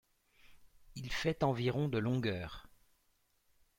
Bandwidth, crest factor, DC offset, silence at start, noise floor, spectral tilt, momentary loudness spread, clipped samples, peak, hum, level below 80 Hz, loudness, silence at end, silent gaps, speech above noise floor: 16.5 kHz; 20 dB; under 0.1%; 0.5 s; -75 dBFS; -6.5 dB/octave; 15 LU; under 0.1%; -18 dBFS; none; -58 dBFS; -36 LUFS; 1.15 s; none; 40 dB